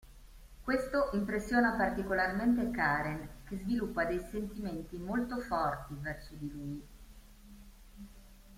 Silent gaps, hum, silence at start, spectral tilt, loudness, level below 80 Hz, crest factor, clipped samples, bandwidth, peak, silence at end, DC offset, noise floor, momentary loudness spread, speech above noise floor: none; none; 0.05 s; -6.5 dB/octave; -34 LUFS; -52 dBFS; 18 dB; under 0.1%; 16 kHz; -16 dBFS; 0 s; under 0.1%; -55 dBFS; 14 LU; 21 dB